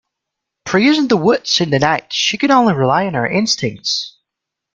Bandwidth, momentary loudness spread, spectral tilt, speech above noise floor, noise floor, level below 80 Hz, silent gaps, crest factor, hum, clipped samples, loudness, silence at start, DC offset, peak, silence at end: 7.6 kHz; 7 LU; -4 dB/octave; 66 dB; -81 dBFS; -54 dBFS; none; 16 dB; none; under 0.1%; -15 LUFS; 0.65 s; under 0.1%; 0 dBFS; 0.65 s